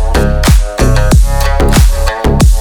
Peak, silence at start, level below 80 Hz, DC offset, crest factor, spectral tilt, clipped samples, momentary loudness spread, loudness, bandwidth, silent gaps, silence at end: 0 dBFS; 0 s; -8 dBFS; under 0.1%; 8 dB; -5.5 dB/octave; 0.5%; 3 LU; -10 LUFS; 19.5 kHz; none; 0 s